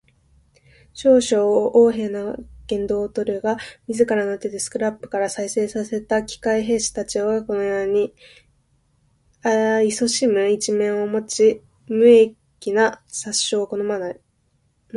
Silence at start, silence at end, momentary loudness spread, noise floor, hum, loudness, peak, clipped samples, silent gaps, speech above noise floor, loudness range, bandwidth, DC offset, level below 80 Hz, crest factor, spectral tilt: 0.95 s; 0 s; 11 LU; -65 dBFS; none; -20 LUFS; -2 dBFS; under 0.1%; none; 45 dB; 5 LU; 11.5 kHz; under 0.1%; -54 dBFS; 18 dB; -3.5 dB/octave